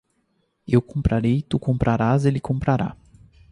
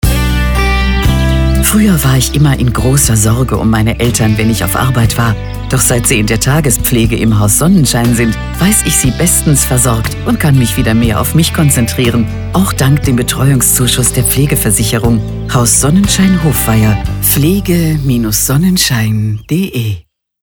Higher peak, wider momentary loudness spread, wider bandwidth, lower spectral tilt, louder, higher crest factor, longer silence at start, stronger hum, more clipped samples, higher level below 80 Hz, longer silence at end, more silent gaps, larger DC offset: second, -4 dBFS vs 0 dBFS; about the same, 5 LU vs 5 LU; second, 11 kHz vs over 20 kHz; first, -8.5 dB/octave vs -4.5 dB/octave; second, -22 LUFS vs -10 LUFS; first, 18 dB vs 10 dB; first, 0.7 s vs 0.05 s; neither; neither; second, -38 dBFS vs -20 dBFS; first, 0.6 s vs 0.4 s; neither; neither